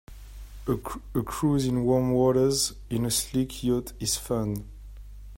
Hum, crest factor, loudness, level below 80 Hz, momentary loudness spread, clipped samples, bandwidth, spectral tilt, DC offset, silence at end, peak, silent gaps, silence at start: none; 16 dB; -26 LUFS; -44 dBFS; 23 LU; under 0.1%; 16.5 kHz; -5 dB/octave; under 0.1%; 0 s; -10 dBFS; none; 0.1 s